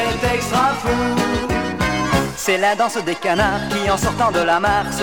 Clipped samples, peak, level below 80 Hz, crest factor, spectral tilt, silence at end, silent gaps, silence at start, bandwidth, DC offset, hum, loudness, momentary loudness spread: under 0.1%; -4 dBFS; -34 dBFS; 14 dB; -4.5 dB/octave; 0 s; none; 0 s; 19.5 kHz; 0.5%; none; -18 LUFS; 4 LU